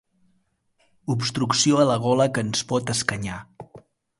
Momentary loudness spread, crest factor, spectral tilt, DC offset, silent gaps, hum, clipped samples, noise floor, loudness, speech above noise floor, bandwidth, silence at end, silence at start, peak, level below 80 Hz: 13 LU; 22 dB; -4 dB/octave; under 0.1%; none; none; under 0.1%; -69 dBFS; -22 LUFS; 46 dB; 11.5 kHz; 0.4 s; 1.05 s; -2 dBFS; -56 dBFS